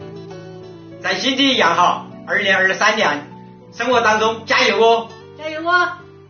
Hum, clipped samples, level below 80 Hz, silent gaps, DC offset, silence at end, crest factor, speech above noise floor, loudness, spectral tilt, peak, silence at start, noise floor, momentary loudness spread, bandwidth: none; under 0.1%; -62 dBFS; none; under 0.1%; 0.25 s; 16 dB; 20 dB; -16 LUFS; -0.5 dB/octave; -2 dBFS; 0 s; -36 dBFS; 21 LU; 6.8 kHz